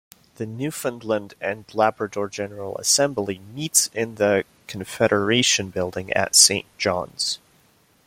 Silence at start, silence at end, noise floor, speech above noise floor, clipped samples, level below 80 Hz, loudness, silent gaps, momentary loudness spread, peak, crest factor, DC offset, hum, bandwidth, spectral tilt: 0.4 s; 0.7 s; -59 dBFS; 37 dB; under 0.1%; -62 dBFS; -21 LUFS; none; 14 LU; 0 dBFS; 24 dB; under 0.1%; none; 16.5 kHz; -2 dB/octave